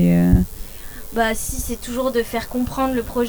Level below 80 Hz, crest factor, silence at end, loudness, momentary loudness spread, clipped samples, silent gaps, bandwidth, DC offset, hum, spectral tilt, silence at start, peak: -30 dBFS; 20 dB; 0 s; -21 LUFS; 13 LU; under 0.1%; none; over 20 kHz; under 0.1%; none; -6 dB/octave; 0 s; 0 dBFS